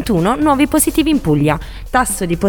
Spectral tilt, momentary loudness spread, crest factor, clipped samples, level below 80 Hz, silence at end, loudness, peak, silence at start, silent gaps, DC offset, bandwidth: -5 dB/octave; 5 LU; 14 dB; under 0.1%; -30 dBFS; 0 s; -15 LUFS; 0 dBFS; 0 s; none; under 0.1%; 19 kHz